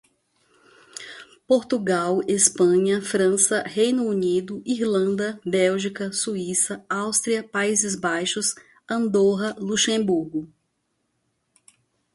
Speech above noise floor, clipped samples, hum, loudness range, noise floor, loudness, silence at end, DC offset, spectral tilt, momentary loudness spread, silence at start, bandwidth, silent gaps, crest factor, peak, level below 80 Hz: 51 dB; under 0.1%; none; 3 LU; -74 dBFS; -22 LUFS; 1.7 s; under 0.1%; -3.5 dB/octave; 10 LU; 0.95 s; 11.5 kHz; none; 22 dB; -2 dBFS; -66 dBFS